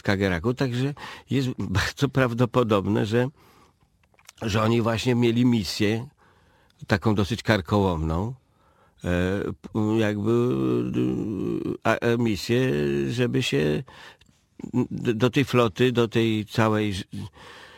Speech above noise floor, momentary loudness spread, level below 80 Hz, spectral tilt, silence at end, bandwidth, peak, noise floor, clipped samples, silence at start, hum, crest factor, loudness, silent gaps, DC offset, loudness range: 39 dB; 9 LU; -48 dBFS; -6.5 dB/octave; 0.1 s; 16.5 kHz; -2 dBFS; -63 dBFS; under 0.1%; 0.05 s; none; 22 dB; -24 LUFS; none; under 0.1%; 2 LU